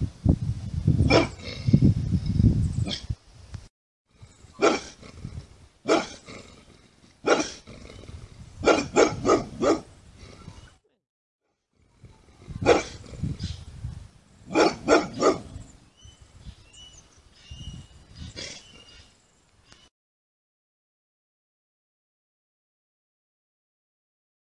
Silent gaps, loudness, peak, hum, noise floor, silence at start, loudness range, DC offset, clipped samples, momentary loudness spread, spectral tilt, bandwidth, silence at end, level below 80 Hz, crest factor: 3.70-4.05 s, 11.09-11.39 s; -24 LUFS; -4 dBFS; none; -68 dBFS; 0 s; 19 LU; under 0.1%; under 0.1%; 24 LU; -6 dB/octave; 11 kHz; 5.95 s; -42 dBFS; 24 dB